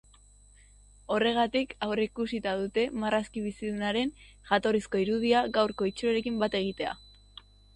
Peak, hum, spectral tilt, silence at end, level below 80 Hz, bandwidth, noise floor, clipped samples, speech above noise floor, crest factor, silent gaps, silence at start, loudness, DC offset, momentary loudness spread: -12 dBFS; 50 Hz at -55 dBFS; -5 dB/octave; 0.8 s; -56 dBFS; 11 kHz; -57 dBFS; under 0.1%; 28 dB; 18 dB; none; 1.1 s; -29 LUFS; under 0.1%; 9 LU